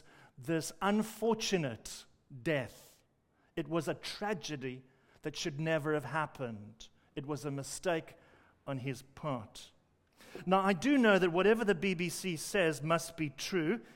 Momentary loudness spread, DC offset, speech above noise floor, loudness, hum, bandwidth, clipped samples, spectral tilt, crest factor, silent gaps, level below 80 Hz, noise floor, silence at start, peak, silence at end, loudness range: 18 LU; under 0.1%; 39 dB; -34 LUFS; none; 16 kHz; under 0.1%; -5 dB/octave; 20 dB; none; -66 dBFS; -73 dBFS; 0.4 s; -14 dBFS; 0 s; 10 LU